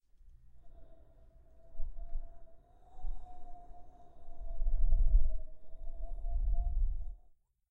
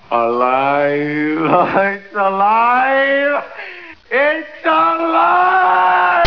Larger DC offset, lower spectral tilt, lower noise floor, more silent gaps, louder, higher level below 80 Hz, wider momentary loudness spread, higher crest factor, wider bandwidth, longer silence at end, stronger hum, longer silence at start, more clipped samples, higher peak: second, under 0.1% vs 0.4%; first, -10 dB/octave vs -7 dB/octave; first, -63 dBFS vs -34 dBFS; neither; second, -40 LUFS vs -14 LUFS; first, -34 dBFS vs -60 dBFS; first, 24 LU vs 7 LU; about the same, 16 dB vs 14 dB; second, 1 kHz vs 5.4 kHz; first, 0.55 s vs 0 s; neither; first, 0.25 s vs 0.1 s; neither; second, -16 dBFS vs 0 dBFS